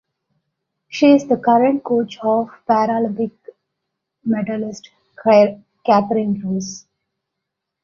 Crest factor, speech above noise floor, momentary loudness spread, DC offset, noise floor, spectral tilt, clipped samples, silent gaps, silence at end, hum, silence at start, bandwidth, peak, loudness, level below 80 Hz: 18 dB; 63 dB; 15 LU; under 0.1%; -80 dBFS; -6 dB/octave; under 0.1%; none; 1.05 s; none; 0.9 s; 7.4 kHz; -2 dBFS; -17 LUFS; -62 dBFS